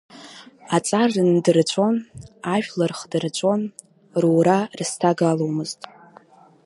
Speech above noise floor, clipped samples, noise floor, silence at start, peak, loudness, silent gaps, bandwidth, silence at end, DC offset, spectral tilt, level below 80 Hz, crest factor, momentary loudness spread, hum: 30 dB; under 0.1%; -50 dBFS; 0.15 s; -2 dBFS; -21 LUFS; none; 11.5 kHz; 0.9 s; under 0.1%; -5.5 dB/octave; -64 dBFS; 18 dB; 16 LU; none